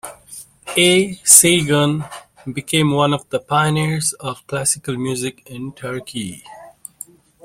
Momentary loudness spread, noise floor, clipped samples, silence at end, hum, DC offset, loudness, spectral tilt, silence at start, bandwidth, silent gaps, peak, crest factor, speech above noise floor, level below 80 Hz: 24 LU; -41 dBFS; under 0.1%; 0.75 s; none; under 0.1%; -15 LUFS; -3 dB/octave; 0.05 s; 16.5 kHz; none; 0 dBFS; 18 dB; 23 dB; -54 dBFS